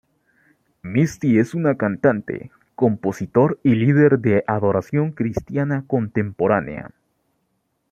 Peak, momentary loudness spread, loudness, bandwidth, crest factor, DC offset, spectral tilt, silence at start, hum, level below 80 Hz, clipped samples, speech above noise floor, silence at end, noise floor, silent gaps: -2 dBFS; 10 LU; -20 LUFS; 9.2 kHz; 18 dB; under 0.1%; -8.5 dB/octave; 0.85 s; none; -54 dBFS; under 0.1%; 52 dB; 1.05 s; -71 dBFS; none